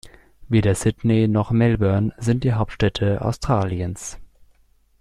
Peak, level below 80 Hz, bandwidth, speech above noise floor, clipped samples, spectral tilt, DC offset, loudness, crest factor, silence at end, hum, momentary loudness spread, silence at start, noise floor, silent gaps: -6 dBFS; -40 dBFS; 12.5 kHz; 38 dB; under 0.1%; -7 dB/octave; under 0.1%; -21 LUFS; 16 dB; 0.75 s; none; 7 LU; 0.05 s; -58 dBFS; none